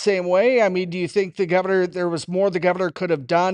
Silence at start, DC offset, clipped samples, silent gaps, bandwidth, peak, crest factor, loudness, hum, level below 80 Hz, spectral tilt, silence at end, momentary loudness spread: 0 s; under 0.1%; under 0.1%; none; 10.5 kHz; -6 dBFS; 14 dB; -21 LUFS; none; -66 dBFS; -6 dB/octave; 0 s; 6 LU